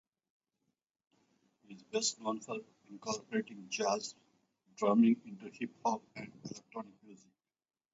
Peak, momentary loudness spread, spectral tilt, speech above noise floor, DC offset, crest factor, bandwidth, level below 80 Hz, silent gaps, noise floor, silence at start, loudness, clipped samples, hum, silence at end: -18 dBFS; 19 LU; -4 dB/octave; over 54 dB; under 0.1%; 20 dB; 7.6 kHz; -84 dBFS; none; under -90 dBFS; 1.7 s; -36 LUFS; under 0.1%; none; 0.8 s